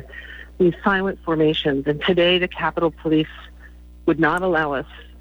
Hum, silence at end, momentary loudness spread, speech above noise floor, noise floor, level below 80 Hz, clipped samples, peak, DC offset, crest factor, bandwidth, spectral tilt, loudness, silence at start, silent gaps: 60 Hz at -40 dBFS; 0.05 s; 15 LU; 23 dB; -42 dBFS; -42 dBFS; under 0.1%; -6 dBFS; under 0.1%; 16 dB; over 20 kHz; -7 dB/octave; -20 LUFS; 0 s; none